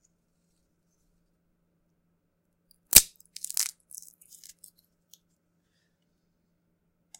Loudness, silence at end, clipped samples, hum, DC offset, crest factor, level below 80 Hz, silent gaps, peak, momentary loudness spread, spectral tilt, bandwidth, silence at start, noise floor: -21 LUFS; 3.5 s; under 0.1%; none; under 0.1%; 34 dB; -52 dBFS; none; 0 dBFS; 28 LU; 1 dB/octave; 17 kHz; 2.95 s; -75 dBFS